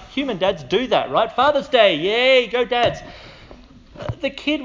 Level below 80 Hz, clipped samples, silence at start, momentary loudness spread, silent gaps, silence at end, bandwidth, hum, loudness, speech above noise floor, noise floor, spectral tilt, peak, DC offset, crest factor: -46 dBFS; under 0.1%; 0 s; 13 LU; none; 0 s; 7.6 kHz; none; -18 LUFS; 25 dB; -44 dBFS; -5 dB/octave; 0 dBFS; under 0.1%; 20 dB